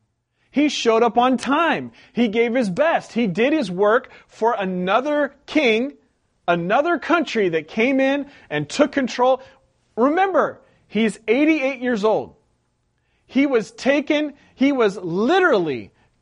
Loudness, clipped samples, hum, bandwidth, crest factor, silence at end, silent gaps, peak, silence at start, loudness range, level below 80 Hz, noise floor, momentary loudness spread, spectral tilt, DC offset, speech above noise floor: -20 LUFS; under 0.1%; none; 10.5 kHz; 18 dB; 0.35 s; none; -2 dBFS; 0.55 s; 2 LU; -62 dBFS; -68 dBFS; 8 LU; -5.5 dB/octave; under 0.1%; 49 dB